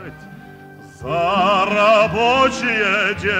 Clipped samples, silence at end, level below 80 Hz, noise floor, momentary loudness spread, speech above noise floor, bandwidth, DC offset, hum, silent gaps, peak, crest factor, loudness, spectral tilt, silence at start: under 0.1%; 0 s; -46 dBFS; -40 dBFS; 10 LU; 24 dB; 15 kHz; under 0.1%; none; none; -4 dBFS; 14 dB; -16 LUFS; -4.5 dB/octave; 0 s